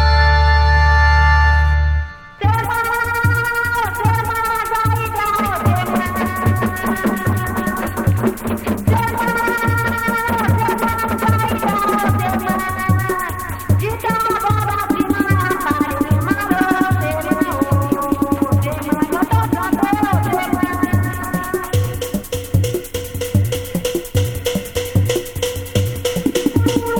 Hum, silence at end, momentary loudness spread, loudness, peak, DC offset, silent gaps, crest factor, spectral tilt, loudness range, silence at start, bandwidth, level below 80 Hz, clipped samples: none; 0 s; 8 LU; -17 LUFS; -2 dBFS; under 0.1%; none; 16 dB; -6 dB/octave; 4 LU; 0 s; 19.5 kHz; -24 dBFS; under 0.1%